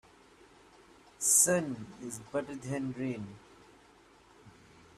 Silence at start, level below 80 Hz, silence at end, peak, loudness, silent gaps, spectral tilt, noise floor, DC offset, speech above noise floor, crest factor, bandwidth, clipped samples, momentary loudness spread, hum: 1.2 s; -70 dBFS; 0.5 s; -10 dBFS; -30 LUFS; none; -3 dB/octave; -61 dBFS; under 0.1%; 28 dB; 26 dB; 15.5 kHz; under 0.1%; 19 LU; none